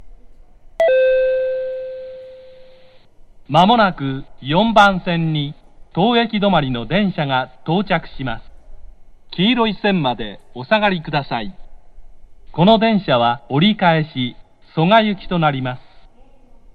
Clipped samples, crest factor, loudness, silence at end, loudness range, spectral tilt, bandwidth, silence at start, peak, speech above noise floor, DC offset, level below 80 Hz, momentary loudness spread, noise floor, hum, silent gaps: under 0.1%; 18 dB; -17 LUFS; 0.75 s; 4 LU; -7 dB/octave; 8.4 kHz; 0 s; 0 dBFS; 28 dB; under 0.1%; -42 dBFS; 15 LU; -44 dBFS; none; none